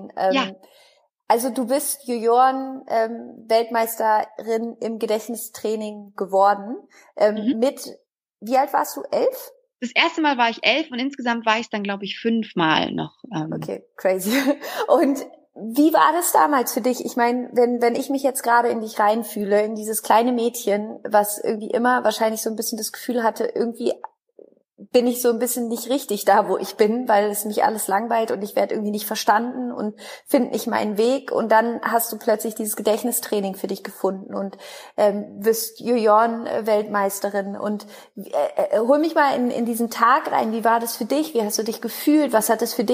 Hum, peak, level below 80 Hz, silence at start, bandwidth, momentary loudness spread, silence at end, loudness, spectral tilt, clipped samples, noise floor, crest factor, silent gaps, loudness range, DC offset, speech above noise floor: none; -2 dBFS; -74 dBFS; 0 s; 15.5 kHz; 11 LU; 0 s; -21 LUFS; -3.5 dB/octave; under 0.1%; -51 dBFS; 20 dB; none; 4 LU; under 0.1%; 30 dB